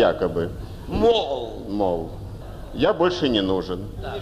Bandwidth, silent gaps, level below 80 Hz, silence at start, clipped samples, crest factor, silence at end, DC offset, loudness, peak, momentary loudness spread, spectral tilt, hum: 14 kHz; none; -38 dBFS; 0 s; under 0.1%; 16 dB; 0 s; under 0.1%; -23 LUFS; -8 dBFS; 16 LU; -6.5 dB/octave; none